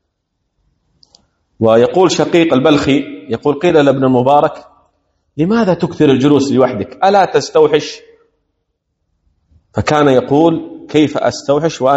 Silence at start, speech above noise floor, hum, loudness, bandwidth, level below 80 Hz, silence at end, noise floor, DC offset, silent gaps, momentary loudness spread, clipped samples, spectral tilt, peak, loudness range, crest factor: 1.6 s; 58 dB; none; -12 LUFS; 8.2 kHz; -48 dBFS; 0 s; -69 dBFS; under 0.1%; none; 8 LU; 0.2%; -6 dB/octave; 0 dBFS; 4 LU; 14 dB